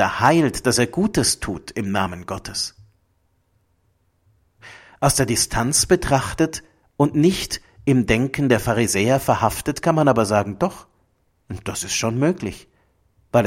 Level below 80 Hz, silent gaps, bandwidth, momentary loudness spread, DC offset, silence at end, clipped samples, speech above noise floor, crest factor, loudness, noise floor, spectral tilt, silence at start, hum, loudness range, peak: -42 dBFS; none; 16.5 kHz; 11 LU; under 0.1%; 0 s; under 0.1%; 45 dB; 20 dB; -20 LUFS; -65 dBFS; -4.5 dB/octave; 0 s; none; 7 LU; 0 dBFS